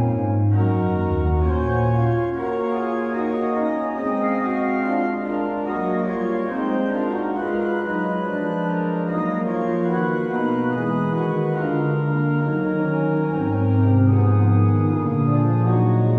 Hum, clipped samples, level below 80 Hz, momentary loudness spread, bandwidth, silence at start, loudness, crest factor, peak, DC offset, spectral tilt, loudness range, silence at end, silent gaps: none; under 0.1%; -38 dBFS; 6 LU; 4.4 kHz; 0 s; -21 LUFS; 14 dB; -6 dBFS; under 0.1%; -10.5 dB/octave; 4 LU; 0 s; none